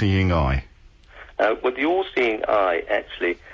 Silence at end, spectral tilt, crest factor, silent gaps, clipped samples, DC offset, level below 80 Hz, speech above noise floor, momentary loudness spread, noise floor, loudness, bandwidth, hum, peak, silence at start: 0 s; -8 dB/octave; 14 dB; none; under 0.1%; under 0.1%; -36 dBFS; 26 dB; 6 LU; -47 dBFS; -22 LUFS; 7.2 kHz; none; -8 dBFS; 0 s